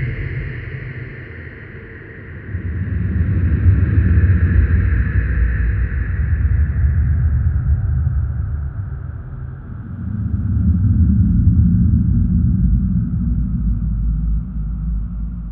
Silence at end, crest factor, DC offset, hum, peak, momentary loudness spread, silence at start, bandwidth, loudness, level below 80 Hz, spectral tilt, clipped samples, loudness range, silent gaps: 0 s; 14 dB; under 0.1%; none; -2 dBFS; 16 LU; 0 s; 3.1 kHz; -18 LUFS; -20 dBFS; -13 dB/octave; under 0.1%; 6 LU; none